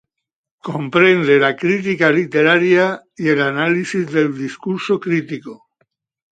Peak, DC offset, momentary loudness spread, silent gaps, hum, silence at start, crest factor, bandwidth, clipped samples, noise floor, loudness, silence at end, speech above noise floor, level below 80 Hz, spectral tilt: 0 dBFS; under 0.1%; 13 LU; none; none; 0.65 s; 16 dB; 9 kHz; under 0.1%; -82 dBFS; -16 LUFS; 0.8 s; 66 dB; -64 dBFS; -6 dB/octave